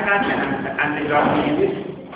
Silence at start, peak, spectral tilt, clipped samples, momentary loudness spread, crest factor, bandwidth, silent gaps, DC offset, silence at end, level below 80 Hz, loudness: 0 s; -4 dBFS; -9.5 dB/octave; under 0.1%; 5 LU; 16 dB; 4 kHz; none; under 0.1%; 0 s; -48 dBFS; -20 LUFS